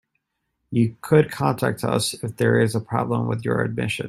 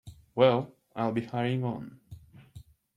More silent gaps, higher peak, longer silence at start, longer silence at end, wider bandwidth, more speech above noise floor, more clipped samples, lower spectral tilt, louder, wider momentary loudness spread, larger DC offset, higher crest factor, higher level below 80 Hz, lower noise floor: neither; first, -4 dBFS vs -8 dBFS; first, 0.7 s vs 0.05 s; second, 0 s vs 0.35 s; first, 14 kHz vs 10.5 kHz; first, 55 dB vs 25 dB; neither; second, -6 dB/octave vs -8 dB/octave; first, -22 LUFS vs -29 LUFS; second, 6 LU vs 17 LU; neither; about the same, 18 dB vs 22 dB; first, -56 dBFS vs -62 dBFS; first, -76 dBFS vs -53 dBFS